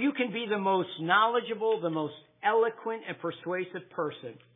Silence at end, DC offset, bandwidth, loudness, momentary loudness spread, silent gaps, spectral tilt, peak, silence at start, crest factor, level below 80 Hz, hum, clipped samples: 0.2 s; under 0.1%; 3.9 kHz; -30 LUFS; 12 LU; none; -9 dB/octave; -10 dBFS; 0 s; 20 dB; under -90 dBFS; none; under 0.1%